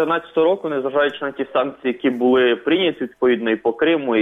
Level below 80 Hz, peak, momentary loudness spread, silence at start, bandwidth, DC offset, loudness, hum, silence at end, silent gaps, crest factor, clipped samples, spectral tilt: -62 dBFS; -6 dBFS; 5 LU; 0 s; 3.9 kHz; under 0.1%; -19 LUFS; none; 0 s; none; 12 dB; under 0.1%; -7 dB/octave